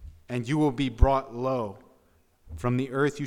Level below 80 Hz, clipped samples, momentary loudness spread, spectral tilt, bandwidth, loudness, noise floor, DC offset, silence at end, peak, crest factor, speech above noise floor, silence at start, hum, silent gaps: -32 dBFS; under 0.1%; 11 LU; -7 dB/octave; 12.5 kHz; -27 LUFS; -63 dBFS; under 0.1%; 0 s; -6 dBFS; 22 dB; 38 dB; 0 s; none; none